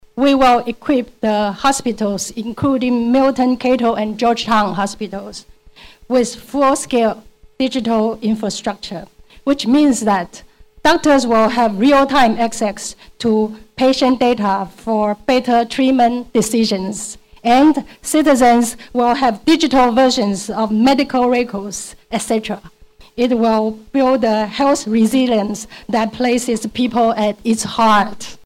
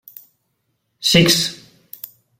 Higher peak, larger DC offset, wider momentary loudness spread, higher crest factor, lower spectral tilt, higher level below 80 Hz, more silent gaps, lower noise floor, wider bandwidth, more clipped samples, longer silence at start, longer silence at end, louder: second, -6 dBFS vs -2 dBFS; neither; second, 11 LU vs 23 LU; second, 10 dB vs 20 dB; about the same, -4.5 dB/octave vs -3.5 dB/octave; first, -44 dBFS vs -50 dBFS; neither; second, -42 dBFS vs -70 dBFS; about the same, 16 kHz vs 16.5 kHz; neither; second, 0.15 s vs 1 s; second, 0.1 s vs 0.85 s; about the same, -15 LUFS vs -15 LUFS